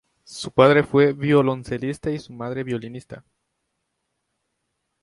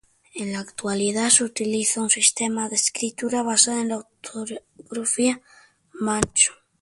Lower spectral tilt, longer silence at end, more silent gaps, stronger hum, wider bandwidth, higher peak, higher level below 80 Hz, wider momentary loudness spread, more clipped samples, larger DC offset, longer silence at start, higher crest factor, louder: first, -6.5 dB/octave vs -2 dB/octave; first, 1.85 s vs 0.3 s; neither; neither; about the same, 11.5 kHz vs 11.5 kHz; about the same, 0 dBFS vs -2 dBFS; about the same, -56 dBFS vs -54 dBFS; about the same, 18 LU vs 16 LU; neither; neither; about the same, 0.3 s vs 0.35 s; about the same, 22 dB vs 22 dB; about the same, -20 LUFS vs -21 LUFS